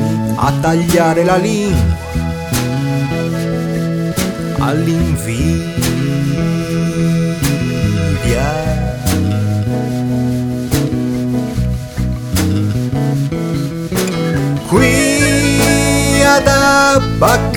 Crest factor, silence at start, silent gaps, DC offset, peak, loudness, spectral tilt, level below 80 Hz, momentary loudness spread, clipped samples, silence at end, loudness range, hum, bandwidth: 14 dB; 0 s; none; under 0.1%; 0 dBFS; -14 LUFS; -5.5 dB/octave; -28 dBFS; 7 LU; under 0.1%; 0 s; 5 LU; none; 20 kHz